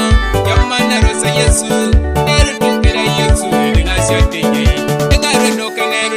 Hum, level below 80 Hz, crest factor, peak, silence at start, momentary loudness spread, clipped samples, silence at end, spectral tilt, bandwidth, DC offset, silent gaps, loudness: none; -16 dBFS; 12 dB; 0 dBFS; 0 s; 2 LU; 0.2%; 0 s; -4.5 dB/octave; 16 kHz; 0.4%; none; -12 LUFS